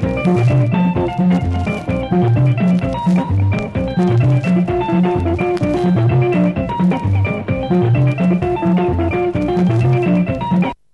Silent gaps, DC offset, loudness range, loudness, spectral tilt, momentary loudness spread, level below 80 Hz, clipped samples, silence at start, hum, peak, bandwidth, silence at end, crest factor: none; 0.2%; 1 LU; -16 LUFS; -9 dB/octave; 4 LU; -34 dBFS; under 0.1%; 0 s; none; -2 dBFS; 8.2 kHz; 0.2 s; 12 dB